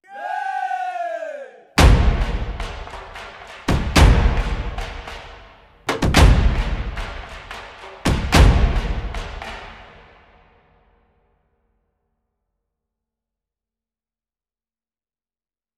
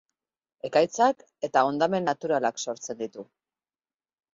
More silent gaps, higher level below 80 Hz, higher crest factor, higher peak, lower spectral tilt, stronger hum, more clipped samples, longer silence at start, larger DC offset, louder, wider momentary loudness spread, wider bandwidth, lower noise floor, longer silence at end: neither; first, -22 dBFS vs -72 dBFS; about the same, 20 dB vs 20 dB; first, 0 dBFS vs -6 dBFS; first, -5.5 dB/octave vs -4 dB/octave; neither; neither; second, 0.1 s vs 0.65 s; neither; first, -19 LUFS vs -26 LUFS; first, 21 LU vs 13 LU; first, 14.5 kHz vs 8 kHz; about the same, under -90 dBFS vs under -90 dBFS; first, 5.95 s vs 1.1 s